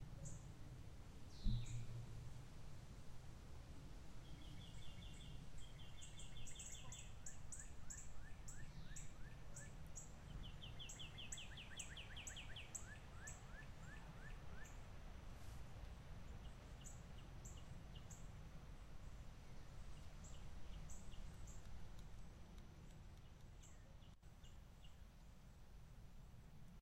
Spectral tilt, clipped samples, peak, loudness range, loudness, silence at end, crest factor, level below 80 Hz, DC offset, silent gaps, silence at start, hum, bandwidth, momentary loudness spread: -3.5 dB/octave; under 0.1%; -30 dBFS; 8 LU; -58 LUFS; 0 s; 24 dB; -58 dBFS; under 0.1%; none; 0 s; none; 16 kHz; 11 LU